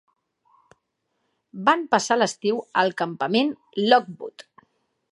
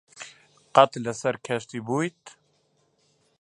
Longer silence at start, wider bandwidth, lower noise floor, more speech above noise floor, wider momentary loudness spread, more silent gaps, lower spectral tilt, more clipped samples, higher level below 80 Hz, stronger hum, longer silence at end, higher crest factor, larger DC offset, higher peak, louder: first, 1.55 s vs 0.2 s; about the same, 11.5 kHz vs 11 kHz; first, -75 dBFS vs -68 dBFS; first, 53 dB vs 44 dB; second, 18 LU vs 23 LU; neither; about the same, -4 dB/octave vs -5 dB/octave; neither; second, -78 dBFS vs -72 dBFS; neither; second, 0.75 s vs 1.1 s; about the same, 22 dB vs 26 dB; neither; about the same, -2 dBFS vs 0 dBFS; first, -22 LUFS vs -25 LUFS